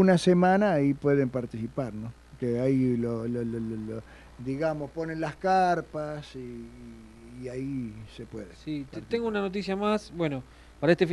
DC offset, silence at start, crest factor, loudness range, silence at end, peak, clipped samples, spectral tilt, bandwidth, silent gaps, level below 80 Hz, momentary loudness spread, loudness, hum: under 0.1%; 0 s; 20 dB; 8 LU; 0 s; -8 dBFS; under 0.1%; -7 dB/octave; 11.5 kHz; none; -54 dBFS; 18 LU; -28 LUFS; none